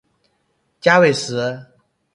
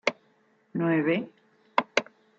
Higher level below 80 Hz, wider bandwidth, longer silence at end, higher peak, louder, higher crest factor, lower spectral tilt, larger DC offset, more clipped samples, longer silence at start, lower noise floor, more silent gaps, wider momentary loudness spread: first, -62 dBFS vs -76 dBFS; first, 11.5 kHz vs 7.6 kHz; first, 0.5 s vs 0.35 s; first, 0 dBFS vs -4 dBFS; first, -17 LUFS vs -28 LUFS; about the same, 20 dB vs 24 dB; about the same, -4.5 dB/octave vs -5.5 dB/octave; neither; neither; first, 0.85 s vs 0.05 s; about the same, -67 dBFS vs -65 dBFS; neither; first, 13 LU vs 9 LU